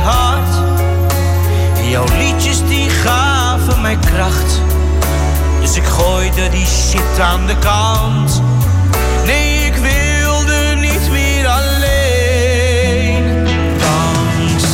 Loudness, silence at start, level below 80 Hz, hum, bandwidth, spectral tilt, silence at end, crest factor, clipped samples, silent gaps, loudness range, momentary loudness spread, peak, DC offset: -13 LUFS; 0 s; -16 dBFS; none; 16.5 kHz; -4.5 dB/octave; 0 s; 10 dB; under 0.1%; none; 1 LU; 2 LU; -2 dBFS; under 0.1%